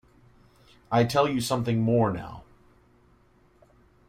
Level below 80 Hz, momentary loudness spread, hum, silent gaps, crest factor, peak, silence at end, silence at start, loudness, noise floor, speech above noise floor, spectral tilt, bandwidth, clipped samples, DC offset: -56 dBFS; 15 LU; none; none; 20 dB; -8 dBFS; 1.65 s; 0.9 s; -25 LUFS; -60 dBFS; 36 dB; -6 dB/octave; 15.5 kHz; under 0.1%; under 0.1%